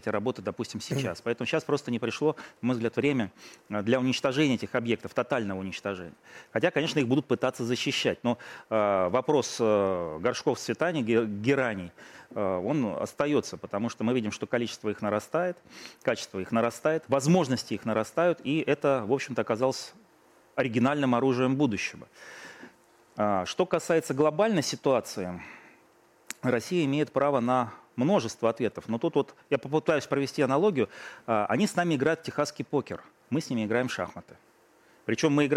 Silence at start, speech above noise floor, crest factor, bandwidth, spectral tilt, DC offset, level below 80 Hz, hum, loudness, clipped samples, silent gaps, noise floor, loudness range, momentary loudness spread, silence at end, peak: 0.05 s; 33 dB; 20 dB; 16 kHz; -5.5 dB/octave; under 0.1%; -68 dBFS; none; -28 LUFS; under 0.1%; none; -61 dBFS; 3 LU; 10 LU; 0 s; -10 dBFS